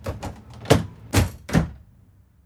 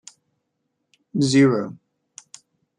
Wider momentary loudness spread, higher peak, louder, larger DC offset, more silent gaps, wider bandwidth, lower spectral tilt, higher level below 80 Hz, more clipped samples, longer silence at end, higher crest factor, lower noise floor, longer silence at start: second, 15 LU vs 26 LU; about the same, -2 dBFS vs -4 dBFS; second, -23 LUFS vs -19 LUFS; neither; neither; first, 18 kHz vs 10.5 kHz; about the same, -5.5 dB/octave vs -5.5 dB/octave; first, -36 dBFS vs -66 dBFS; neither; second, 0.7 s vs 1.05 s; about the same, 24 dB vs 20 dB; second, -54 dBFS vs -76 dBFS; second, 0 s vs 1.15 s